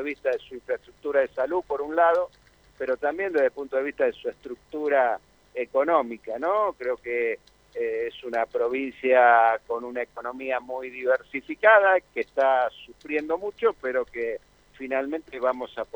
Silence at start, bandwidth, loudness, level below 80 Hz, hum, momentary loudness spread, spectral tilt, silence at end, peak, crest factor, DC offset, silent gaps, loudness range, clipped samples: 0 s; over 20 kHz; -25 LUFS; -64 dBFS; none; 14 LU; -5 dB/octave; 0.1 s; -4 dBFS; 22 dB; under 0.1%; none; 4 LU; under 0.1%